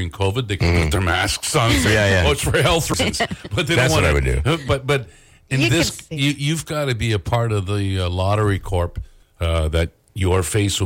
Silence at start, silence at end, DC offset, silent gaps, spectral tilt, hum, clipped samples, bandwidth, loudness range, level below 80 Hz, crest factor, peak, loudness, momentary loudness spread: 0 s; 0 s; under 0.1%; none; -4.5 dB/octave; none; under 0.1%; 16.5 kHz; 4 LU; -32 dBFS; 12 dB; -8 dBFS; -19 LUFS; 7 LU